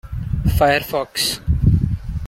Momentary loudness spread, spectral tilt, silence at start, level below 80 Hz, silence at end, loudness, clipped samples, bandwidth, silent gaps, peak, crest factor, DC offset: 7 LU; -5 dB/octave; 0.05 s; -26 dBFS; 0 s; -19 LUFS; under 0.1%; 16.5 kHz; none; -2 dBFS; 16 dB; under 0.1%